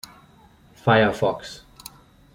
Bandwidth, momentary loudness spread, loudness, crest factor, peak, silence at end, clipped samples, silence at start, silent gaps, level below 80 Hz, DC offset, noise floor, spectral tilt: 16.5 kHz; 24 LU; -21 LUFS; 22 dB; -4 dBFS; 0.8 s; under 0.1%; 0.85 s; none; -54 dBFS; under 0.1%; -53 dBFS; -6 dB/octave